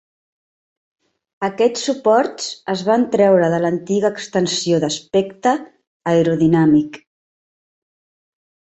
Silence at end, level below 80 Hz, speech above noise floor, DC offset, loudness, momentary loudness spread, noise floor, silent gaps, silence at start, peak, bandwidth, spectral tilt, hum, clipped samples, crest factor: 1.75 s; -60 dBFS; over 74 dB; under 0.1%; -17 LUFS; 10 LU; under -90 dBFS; 5.87-6.00 s; 1.4 s; -2 dBFS; 8.2 kHz; -5.5 dB/octave; none; under 0.1%; 16 dB